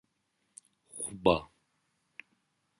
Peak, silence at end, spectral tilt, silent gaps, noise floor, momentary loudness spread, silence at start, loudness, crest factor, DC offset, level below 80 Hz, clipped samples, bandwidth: -10 dBFS; 1.35 s; -4.5 dB/octave; none; -78 dBFS; 24 LU; 0.95 s; -31 LUFS; 26 dB; under 0.1%; -58 dBFS; under 0.1%; 11.5 kHz